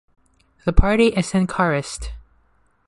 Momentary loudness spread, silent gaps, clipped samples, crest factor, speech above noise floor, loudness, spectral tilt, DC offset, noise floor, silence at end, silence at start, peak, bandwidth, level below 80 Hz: 15 LU; none; under 0.1%; 18 dB; 42 dB; -20 LUFS; -6 dB/octave; under 0.1%; -60 dBFS; 0.65 s; 0.65 s; -2 dBFS; 11.5 kHz; -28 dBFS